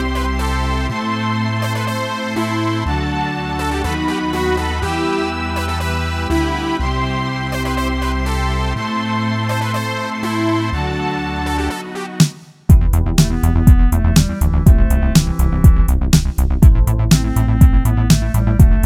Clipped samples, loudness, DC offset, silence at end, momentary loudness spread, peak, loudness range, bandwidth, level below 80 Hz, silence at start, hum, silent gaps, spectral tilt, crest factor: under 0.1%; -17 LUFS; under 0.1%; 0 s; 8 LU; 0 dBFS; 5 LU; 16.5 kHz; -18 dBFS; 0 s; none; none; -6 dB/octave; 14 dB